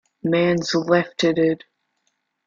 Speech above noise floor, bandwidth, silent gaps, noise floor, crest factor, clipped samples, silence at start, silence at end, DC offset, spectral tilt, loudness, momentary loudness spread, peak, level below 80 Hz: 53 dB; 7.6 kHz; none; -72 dBFS; 18 dB; under 0.1%; 0.25 s; 0.9 s; under 0.1%; -5.5 dB/octave; -20 LUFS; 4 LU; -4 dBFS; -60 dBFS